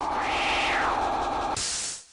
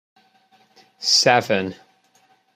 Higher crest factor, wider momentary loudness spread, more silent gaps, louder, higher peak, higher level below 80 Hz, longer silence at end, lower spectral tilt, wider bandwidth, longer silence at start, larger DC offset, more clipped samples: second, 12 dB vs 22 dB; second, 4 LU vs 12 LU; neither; second, -26 LUFS vs -17 LUFS; second, -16 dBFS vs -2 dBFS; first, -46 dBFS vs -70 dBFS; second, 0.1 s vs 0.8 s; about the same, -1.5 dB/octave vs -2 dB/octave; second, 11 kHz vs 15 kHz; second, 0 s vs 1 s; neither; neither